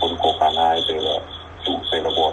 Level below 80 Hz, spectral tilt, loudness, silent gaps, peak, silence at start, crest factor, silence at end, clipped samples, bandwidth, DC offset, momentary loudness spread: -46 dBFS; -4.5 dB/octave; -20 LUFS; none; -4 dBFS; 0 s; 16 dB; 0 s; under 0.1%; 11 kHz; under 0.1%; 9 LU